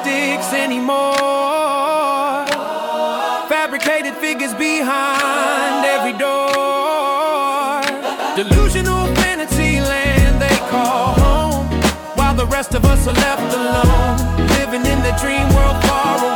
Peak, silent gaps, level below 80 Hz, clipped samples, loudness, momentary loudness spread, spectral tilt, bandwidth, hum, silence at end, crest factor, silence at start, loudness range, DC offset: 0 dBFS; none; -22 dBFS; under 0.1%; -16 LUFS; 4 LU; -5 dB/octave; 18 kHz; none; 0 s; 16 dB; 0 s; 2 LU; under 0.1%